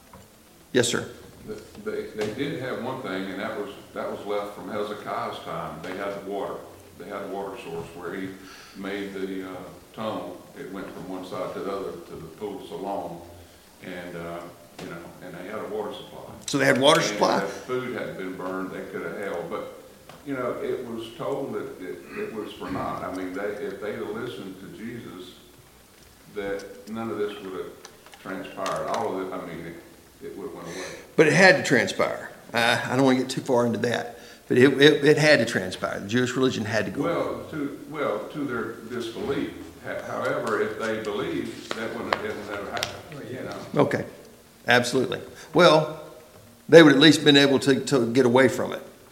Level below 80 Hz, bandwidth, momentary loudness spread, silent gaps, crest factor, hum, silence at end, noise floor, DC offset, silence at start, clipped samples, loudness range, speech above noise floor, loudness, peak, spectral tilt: -60 dBFS; 17 kHz; 21 LU; none; 24 dB; none; 0.15 s; -52 dBFS; under 0.1%; 0.15 s; under 0.1%; 15 LU; 27 dB; -24 LUFS; -2 dBFS; -4.5 dB/octave